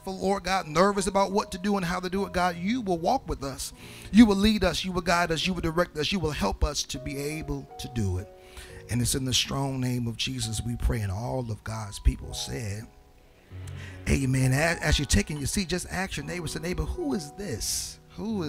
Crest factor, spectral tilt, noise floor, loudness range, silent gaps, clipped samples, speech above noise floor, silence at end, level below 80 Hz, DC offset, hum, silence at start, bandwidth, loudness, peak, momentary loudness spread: 22 dB; -4.5 dB/octave; -55 dBFS; 6 LU; none; under 0.1%; 28 dB; 0 s; -38 dBFS; under 0.1%; none; 0 s; 16 kHz; -27 LUFS; -4 dBFS; 13 LU